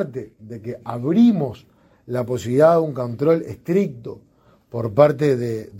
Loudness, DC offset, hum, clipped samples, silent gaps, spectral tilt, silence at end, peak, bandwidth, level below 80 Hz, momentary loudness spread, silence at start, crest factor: -19 LUFS; under 0.1%; none; under 0.1%; none; -8 dB/octave; 0 s; 0 dBFS; 15.5 kHz; -58 dBFS; 18 LU; 0 s; 20 dB